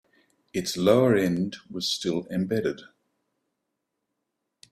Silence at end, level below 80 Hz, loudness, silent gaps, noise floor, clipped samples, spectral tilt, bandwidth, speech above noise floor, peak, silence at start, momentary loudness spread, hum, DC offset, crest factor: 1.9 s; -64 dBFS; -25 LUFS; none; -81 dBFS; under 0.1%; -5 dB/octave; 15.5 kHz; 57 dB; -6 dBFS; 0.55 s; 12 LU; none; under 0.1%; 22 dB